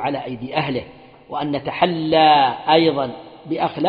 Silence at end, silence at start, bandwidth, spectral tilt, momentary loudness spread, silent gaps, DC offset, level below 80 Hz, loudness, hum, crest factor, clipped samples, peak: 0 s; 0 s; 5.2 kHz; -8 dB/octave; 15 LU; none; under 0.1%; -56 dBFS; -19 LUFS; none; 18 dB; under 0.1%; 0 dBFS